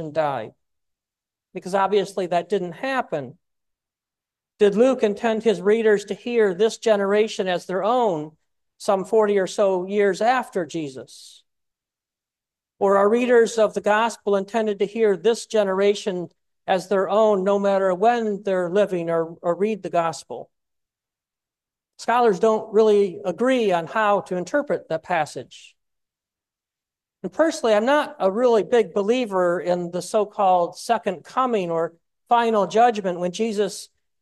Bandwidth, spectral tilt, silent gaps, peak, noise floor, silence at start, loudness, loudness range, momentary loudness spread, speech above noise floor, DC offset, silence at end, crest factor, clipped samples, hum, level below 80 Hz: 12.5 kHz; -5 dB/octave; none; -6 dBFS; -89 dBFS; 0 s; -21 LUFS; 5 LU; 11 LU; 68 dB; under 0.1%; 0.35 s; 16 dB; under 0.1%; none; -72 dBFS